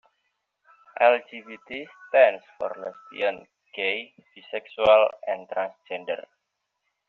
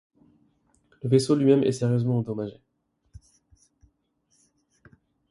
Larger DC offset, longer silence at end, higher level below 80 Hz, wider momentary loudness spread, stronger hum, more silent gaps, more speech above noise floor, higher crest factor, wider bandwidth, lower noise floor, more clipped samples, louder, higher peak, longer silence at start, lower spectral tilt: neither; second, 0.9 s vs 2.75 s; about the same, -66 dBFS vs -62 dBFS; first, 20 LU vs 14 LU; neither; neither; first, 55 dB vs 48 dB; about the same, 22 dB vs 22 dB; second, 4.4 kHz vs 11.5 kHz; first, -80 dBFS vs -70 dBFS; neither; about the same, -24 LUFS vs -24 LUFS; about the same, -4 dBFS vs -6 dBFS; about the same, 1 s vs 1.05 s; second, 0 dB/octave vs -7.5 dB/octave